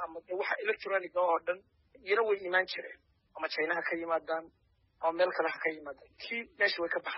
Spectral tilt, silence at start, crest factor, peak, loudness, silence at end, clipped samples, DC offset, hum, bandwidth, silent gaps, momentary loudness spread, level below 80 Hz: 0.5 dB/octave; 0 s; 18 dB; -16 dBFS; -33 LUFS; 0 s; under 0.1%; under 0.1%; none; 5.8 kHz; none; 11 LU; -76 dBFS